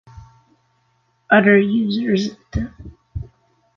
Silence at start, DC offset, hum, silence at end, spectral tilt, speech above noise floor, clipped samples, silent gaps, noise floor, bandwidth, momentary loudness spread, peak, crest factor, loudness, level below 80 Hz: 0.15 s; under 0.1%; none; 0.55 s; -7 dB/octave; 47 dB; under 0.1%; none; -64 dBFS; 7 kHz; 21 LU; -2 dBFS; 18 dB; -17 LUFS; -40 dBFS